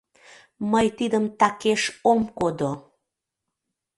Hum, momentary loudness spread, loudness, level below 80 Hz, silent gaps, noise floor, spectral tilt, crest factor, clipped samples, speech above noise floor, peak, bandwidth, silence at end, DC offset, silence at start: none; 8 LU; -23 LUFS; -58 dBFS; none; -83 dBFS; -4.5 dB/octave; 20 dB; under 0.1%; 61 dB; -6 dBFS; 11.5 kHz; 1.15 s; under 0.1%; 0.6 s